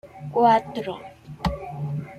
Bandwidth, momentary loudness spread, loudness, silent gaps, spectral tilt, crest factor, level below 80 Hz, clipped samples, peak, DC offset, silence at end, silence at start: 15 kHz; 17 LU; -24 LUFS; none; -7.5 dB/octave; 18 dB; -44 dBFS; under 0.1%; -6 dBFS; under 0.1%; 0 s; 0.05 s